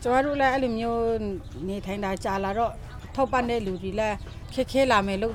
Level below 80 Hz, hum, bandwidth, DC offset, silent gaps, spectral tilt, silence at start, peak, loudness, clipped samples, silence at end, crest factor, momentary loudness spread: -42 dBFS; none; 16 kHz; under 0.1%; none; -5.5 dB/octave; 0 s; -8 dBFS; -26 LUFS; under 0.1%; 0 s; 18 dB; 12 LU